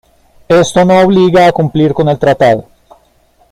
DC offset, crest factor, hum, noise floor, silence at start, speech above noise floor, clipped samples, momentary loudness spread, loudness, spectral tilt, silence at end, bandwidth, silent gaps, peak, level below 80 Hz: under 0.1%; 10 dB; none; -50 dBFS; 0.5 s; 42 dB; under 0.1%; 4 LU; -9 LUFS; -6.5 dB/octave; 0.9 s; 14 kHz; none; 0 dBFS; -40 dBFS